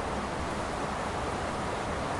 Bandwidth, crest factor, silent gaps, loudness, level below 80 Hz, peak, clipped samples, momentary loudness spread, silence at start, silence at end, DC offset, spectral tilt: 11.5 kHz; 12 dB; none; -33 LUFS; -44 dBFS; -20 dBFS; under 0.1%; 1 LU; 0 s; 0 s; under 0.1%; -5 dB/octave